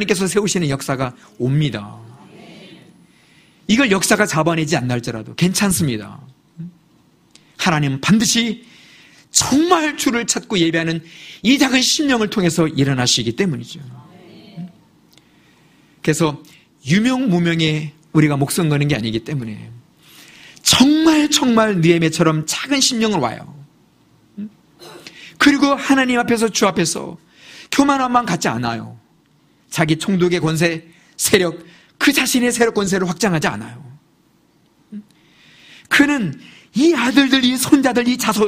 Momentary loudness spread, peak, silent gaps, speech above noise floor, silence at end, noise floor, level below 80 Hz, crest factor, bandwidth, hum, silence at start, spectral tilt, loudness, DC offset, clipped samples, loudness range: 20 LU; 0 dBFS; none; 40 dB; 0 s; -56 dBFS; -50 dBFS; 18 dB; 15.5 kHz; none; 0 s; -4 dB/octave; -16 LUFS; under 0.1%; under 0.1%; 6 LU